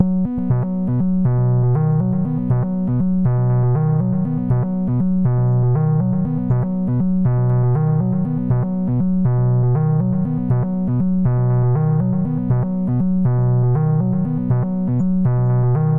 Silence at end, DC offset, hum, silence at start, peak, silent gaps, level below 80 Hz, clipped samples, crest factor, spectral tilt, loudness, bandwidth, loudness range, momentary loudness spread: 0 s; under 0.1%; none; 0 s; -2 dBFS; none; -38 dBFS; under 0.1%; 14 dB; -14 dB/octave; -18 LUFS; 2.3 kHz; 1 LU; 3 LU